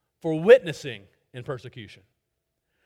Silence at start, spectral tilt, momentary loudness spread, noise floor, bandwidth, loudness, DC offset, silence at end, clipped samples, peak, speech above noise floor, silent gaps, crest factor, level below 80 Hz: 0.25 s; -6 dB/octave; 25 LU; -80 dBFS; 11 kHz; -20 LUFS; under 0.1%; 1 s; under 0.1%; -2 dBFS; 57 dB; none; 22 dB; -68 dBFS